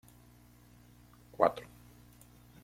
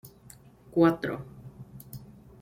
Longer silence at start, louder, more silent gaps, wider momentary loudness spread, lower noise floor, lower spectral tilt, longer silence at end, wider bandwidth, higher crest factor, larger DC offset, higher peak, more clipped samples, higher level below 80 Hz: first, 1.4 s vs 0.05 s; second, -31 LUFS vs -27 LUFS; neither; first, 27 LU vs 24 LU; first, -60 dBFS vs -53 dBFS; second, -6 dB/octave vs -7.5 dB/octave; first, 1 s vs 0.3 s; about the same, 16.5 kHz vs 16 kHz; first, 30 dB vs 20 dB; neither; about the same, -8 dBFS vs -10 dBFS; neither; about the same, -64 dBFS vs -60 dBFS